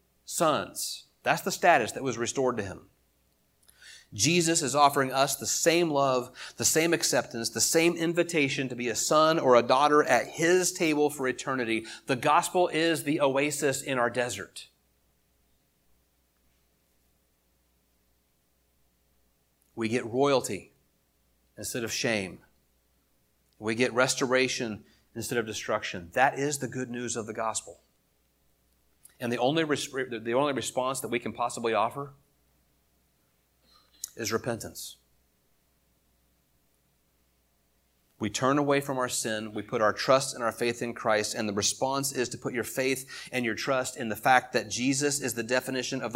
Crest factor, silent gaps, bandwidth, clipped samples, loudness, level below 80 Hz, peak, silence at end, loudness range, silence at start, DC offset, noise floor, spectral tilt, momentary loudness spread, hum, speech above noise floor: 24 dB; none; 16.5 kHz; under 0.1%; -27 LUFS; -68 dBFS; -6 dBFS; 0 s; 12 LU; 0.3 s; under 0.1%; -71 dBFS; -3 dB/octave; 12 LU; none; 43 dB